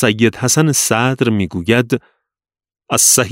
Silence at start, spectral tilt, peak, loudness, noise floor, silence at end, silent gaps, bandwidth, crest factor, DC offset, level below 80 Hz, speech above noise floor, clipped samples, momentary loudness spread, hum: 0 s; -3.5 dB/octave; 0 dBFS; -14 LUFS; -90 dBFS; 0 s; none; 16.5 kHz; 16 dB; under 0.1%; -50 dBFS; 76 dB; under 0.1%; 8 LU; none